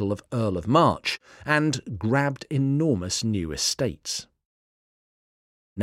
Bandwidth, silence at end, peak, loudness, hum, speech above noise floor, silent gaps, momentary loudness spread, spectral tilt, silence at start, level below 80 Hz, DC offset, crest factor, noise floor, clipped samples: 15.5 kHz; 0 s; -6 dBFS; -25 LUFS; none; over 65 dB; 4.45-5.76 s; 10 LU; -4.5 dB/octave; 0 s; -54 dBFS; under 0.1%; 20 dB; under -90 dBFS; under 0.1%